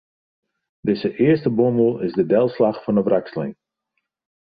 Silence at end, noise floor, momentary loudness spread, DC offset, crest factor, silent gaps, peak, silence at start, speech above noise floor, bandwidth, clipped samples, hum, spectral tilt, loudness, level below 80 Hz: 0.9 s; -76 dBFS; 11 LU; under 0.1%; 16 dB; none; -4 dBFS; 0.85 s; 58 dB; 5 kHz; under 0.1%; none; -11 dB/octave; -20 LUFS; -60 dBFS